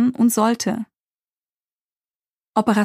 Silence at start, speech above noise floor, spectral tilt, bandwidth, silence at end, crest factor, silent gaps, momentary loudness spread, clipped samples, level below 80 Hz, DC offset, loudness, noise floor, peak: 0 s; over 72 dB; -5 dB/octave; 15.5 kHz; 0 s; 18 dB; 1.15-1.19 s, 1.38-1.42 s, 1.81-1.89 s, 1.97-2.02 s, 2.10-2.20 s, 2.30-2.34 s; 12 LU; under 0.1%; -66 dBFS; under 0.1%; -20 LUFS; under -90 dBFS; -4 dBFS